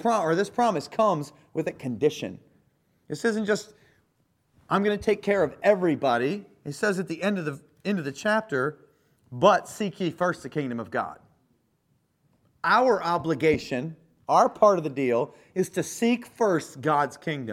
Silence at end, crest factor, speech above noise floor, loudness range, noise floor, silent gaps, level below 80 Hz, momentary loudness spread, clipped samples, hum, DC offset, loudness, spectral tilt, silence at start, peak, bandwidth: 0 s; 22 dB; 45 dB; 5 LU; -70 dBFS; none; -62 dBFS; 11 LU; under 0.1%; none; under 0.1%; -26 LUFS; -5.5 dB/octave; 0 s; -4 dBFS; 15.5 kHz